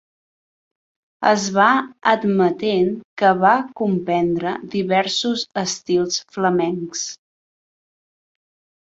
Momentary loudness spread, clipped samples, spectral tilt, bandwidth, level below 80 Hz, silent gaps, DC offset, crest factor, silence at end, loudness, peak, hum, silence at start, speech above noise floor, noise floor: 8 LU; under 0.1%; -4 dB/octave; 8 kHz; -62 dBFS; 3.05-3.17 s; under 0.1%; 20 dB; 1.75 s; -19 LUFS; 0 dBFS; none; 1.2 s; over 71 dB; under -90 dBFS